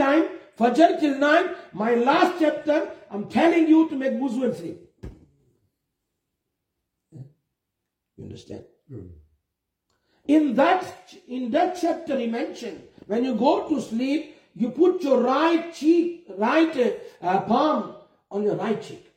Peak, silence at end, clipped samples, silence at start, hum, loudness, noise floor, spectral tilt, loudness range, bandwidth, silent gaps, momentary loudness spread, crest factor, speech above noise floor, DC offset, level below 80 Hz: -4 dBFS; 0.2 s; under 0.1%; 0 s; none; -22 LUFS; -82 dBFS; -6 dB/octave; 5 LU; 10 kHz; none; 19 LU; 20 dB; 60 dB; under 0.1%; -62 dBFS